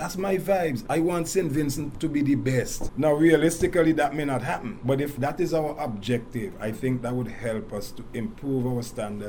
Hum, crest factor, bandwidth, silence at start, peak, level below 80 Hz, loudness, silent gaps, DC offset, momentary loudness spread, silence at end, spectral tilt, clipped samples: none; 18 dB; 19.5 kHz; 0 s; -6 dBFS; -44 dBFS; -26 LUFS; none; under 0.1%; 11 LU; 0 s; -6 dB/octave; under 0.1%